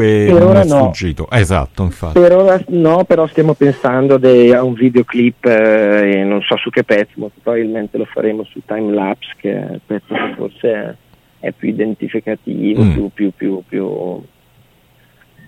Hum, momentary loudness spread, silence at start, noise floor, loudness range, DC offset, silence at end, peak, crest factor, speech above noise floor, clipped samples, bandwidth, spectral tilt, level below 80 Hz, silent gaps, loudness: none; 13 LU; 0 s; -51 dBFS; 9 LU; under 0.1%; 1.3 s; 0 dBFS; 12 dB; 38 dB; under 0.1%; 12.5 kHz; -7.5 dB/octave; -36 dBFS; none; -13 LUFS